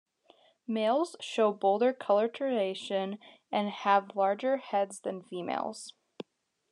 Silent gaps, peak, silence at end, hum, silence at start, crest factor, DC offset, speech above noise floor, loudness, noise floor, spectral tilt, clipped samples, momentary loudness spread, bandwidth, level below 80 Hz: none; -12 dBFS; 0.5 s; none; 0.7 s; 20 dB; under 0.1%; 34 dB; -30 LUFS; -64 dBFS; -4.5 dB/octave; under 0.1%; 19 LU; 11 kHz; under -90 dBFS